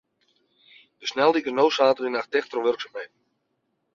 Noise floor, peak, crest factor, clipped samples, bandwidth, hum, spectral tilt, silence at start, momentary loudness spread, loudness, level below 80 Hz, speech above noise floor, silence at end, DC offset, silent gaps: -75 dBFS; -6 dBFS; 20 dB; under 0.1%; 7.2 kHz; none; -3.5 dB/octave; 1 s; 15 LU; -23 LUFS; -74 dBFS; 52 dB; 0.9 s; under 0.1%; none